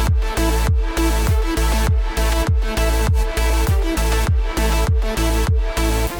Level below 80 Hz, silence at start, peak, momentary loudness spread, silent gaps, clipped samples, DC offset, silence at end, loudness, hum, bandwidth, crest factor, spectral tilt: -18 dBFS; 0 s; -6 dBFS; 2 LU; none; under 0.1%; under 0.1%; 0 s; -19 LUFS; none; 19 kHz; 10 dB; -5 dB/octave